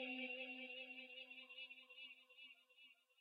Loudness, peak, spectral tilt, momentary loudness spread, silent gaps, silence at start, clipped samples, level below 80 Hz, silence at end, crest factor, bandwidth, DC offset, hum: -53 LUFS; -38 dBFS; 2.5 dB/octave; 18 LU; none; 0 s; under 0.1%; under -90 dBFS; 0.05 s; 18 dB; 7.2 kHz; under 0.1%; none